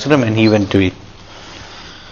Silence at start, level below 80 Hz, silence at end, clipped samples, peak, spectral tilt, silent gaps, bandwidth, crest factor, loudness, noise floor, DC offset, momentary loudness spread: 0 s; -44 dBFS; 0 s; under 0.1%; 0 dBFS; -6.5 dB/octave; none; 7.2 kHz; 16 dB; -14 LUFS; -35 dBFS; under 0.1%; 22 LU